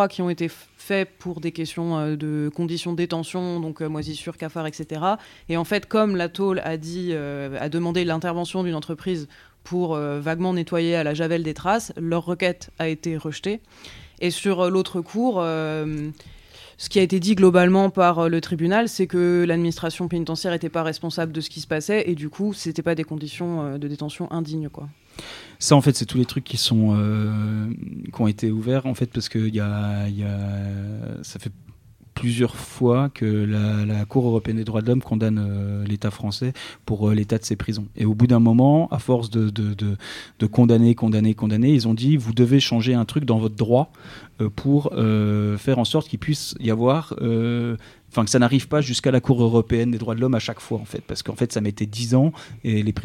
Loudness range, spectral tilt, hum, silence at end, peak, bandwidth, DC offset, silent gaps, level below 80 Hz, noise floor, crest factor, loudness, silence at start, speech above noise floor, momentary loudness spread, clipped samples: 7 LU; -6.5 dB/octave; none; 0 s; 0 dBFS; 15 kHz; under 0.1%; none; -52 dBFS; -48 dBFS; 22 dB; -22 LUFS; 0 s; 27 dB; 12 LU; under 0.1%